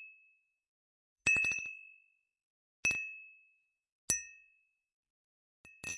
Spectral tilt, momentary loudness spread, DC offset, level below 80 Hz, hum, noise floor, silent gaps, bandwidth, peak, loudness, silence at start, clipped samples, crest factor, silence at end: -0.5 dB/octave; 22 LU; under 0.1%; -68 dBFS; none; -74 dBFS; 0.68-1.16 s, 2.43-2.83 s, 3.92-4.08 s, 4.93-5.03 s, 5.10-5.64 s; 11.5 kHz; -12 dBFS; -33 LUFS; 0 s; under 0.1%; 28 dB; 0 s